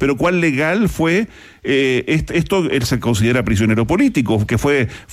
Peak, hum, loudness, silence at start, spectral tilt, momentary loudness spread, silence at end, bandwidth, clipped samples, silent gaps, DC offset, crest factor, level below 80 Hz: -6 dBFS; none; -16 LUFS; 0 s; -6 dB/octave; 3 LU; 0 s; 16 kHz; under 0.1%; none; under 0.1%; 10 dB; -36 dBFS